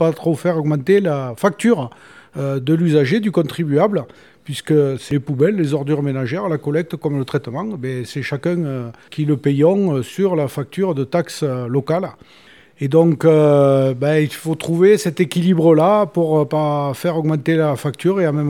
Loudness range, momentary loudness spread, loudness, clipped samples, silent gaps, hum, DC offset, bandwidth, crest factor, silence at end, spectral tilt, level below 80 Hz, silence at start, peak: 5 LU; 11 LU; -17 LUFS; under 0.1%; none; none; 0.1%; 16 kHz; 16 dB; 0 s; -7.5 dB/octave; -62 dBFS; 0 s; -2 dBFS